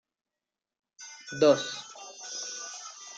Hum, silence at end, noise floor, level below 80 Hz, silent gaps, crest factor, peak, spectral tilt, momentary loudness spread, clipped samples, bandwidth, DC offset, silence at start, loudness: none; 0 s; -90 dBFS; -80 dBFS; none; 22 dB; -10 dBFS; -3 dB/octave; 21 LU; under 0.1%; 9.2 kHz; under 0.1%; 1 s; -29 LUFS